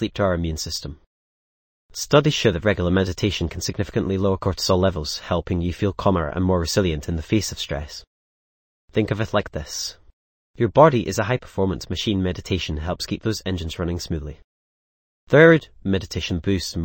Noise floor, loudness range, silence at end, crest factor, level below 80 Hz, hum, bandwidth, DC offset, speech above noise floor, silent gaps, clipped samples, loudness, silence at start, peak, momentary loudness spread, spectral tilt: under -90 dBFS; 5 LU; 0 s; 22 dB; -40 dBFS; none; 17 kHz; under 0.1%; over 69 dB; 1.06-1.89 s, 8.07-8.88 s, 10.13-10.54 s, 14.44-15.27 s; under 0.1%; -22 LUFS; 0 s; 0 dBFS; 12 LU; -5.5 dB/octave